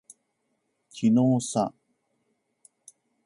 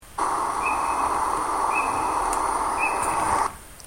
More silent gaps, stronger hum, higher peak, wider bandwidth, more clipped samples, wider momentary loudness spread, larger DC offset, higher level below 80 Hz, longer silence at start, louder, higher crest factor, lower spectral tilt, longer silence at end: neither; neither; about the same, -12 dBFS vs -10 dBFS; second, 11.5 kHz vs 16.5 kHz; neither; first, 11 LU vs 2 LU; neither; second, -70 dBFS vs -46 dBFS; first, 0.95 s vs 0 s; about the same, -25 LUFS vs -24 LUFS; about the same, 18 dB vs 16 dB; first, -6.5 dB/octave vs -2.5 dB/octave; first, 1.55 s vs 0 s